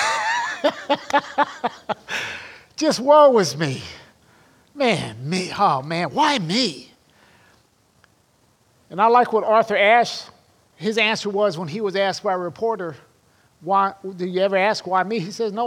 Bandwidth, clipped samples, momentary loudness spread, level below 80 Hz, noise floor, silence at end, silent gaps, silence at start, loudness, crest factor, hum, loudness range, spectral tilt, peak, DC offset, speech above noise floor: 15.5 kHz; under 0.1%; 14 LU; -66 dBFS; -60 dBFS; 0 s; none; 0 s; -20 LUFS; 18 dB; none; 4 LU; -4 dB/octave; -2 dBFS; under 0.1%; 40 dB